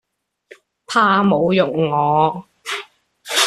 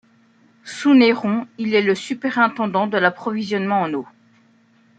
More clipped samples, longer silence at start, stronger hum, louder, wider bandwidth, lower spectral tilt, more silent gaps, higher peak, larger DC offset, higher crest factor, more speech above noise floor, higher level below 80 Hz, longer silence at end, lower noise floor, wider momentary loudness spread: neither; first, 0.9 s vs 0.65 s; neither; about the same, -17 LUFS vs -19 LUFS; first, 14 kHz vs 9 kHz; second, -4 dB/octave vs -5.5 dB/octave; neither; about the same, -2 dBFS vs -2 dBFS; neither; about the same, 16 dB vs 18 dB; second, 33 dB vs 37 dB; first, -58 dBFS vs -70 dBFS; second, 0 s vs 0.95 s; second, -48 dBFS vs -56 dBFS; about the same, 13 LU vs 11 LU